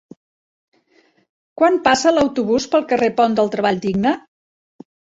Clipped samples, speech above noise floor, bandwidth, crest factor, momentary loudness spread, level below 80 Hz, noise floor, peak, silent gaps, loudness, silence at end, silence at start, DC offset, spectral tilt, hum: under 0.1%; 42 dB; 8 kHz; 18 dB; 5 LU; -54 dBFS; -58 dBFS; -2 dBFS; none; -17 LUFS; 0.95 s; 1.6 s; under 0.1%; -4.5 dB/octave; none